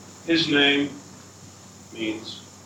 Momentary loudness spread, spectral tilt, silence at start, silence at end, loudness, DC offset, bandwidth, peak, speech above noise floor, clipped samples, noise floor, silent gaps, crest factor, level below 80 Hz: 24 LU; -3.5 dB/octave; 0 s; 0.05 s; -22 LUFS; under 0.1%; 14.5 kHz; -6 dBFS; 23 dB; under 0.1%; -46 dBFS; none; 20 dB; -68 dBFS